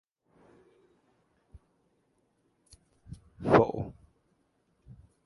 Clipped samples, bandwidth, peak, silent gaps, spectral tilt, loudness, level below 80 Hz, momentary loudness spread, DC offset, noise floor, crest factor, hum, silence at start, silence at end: under 0.1%; 11.5 kHz; -6 dBFS; none; -8 dB/octave; -27 LUFS; -58 dBFS; 27 LU; under 0.1%; -73 dBFS; 30 dB; none; 3.1 s; 1.35 s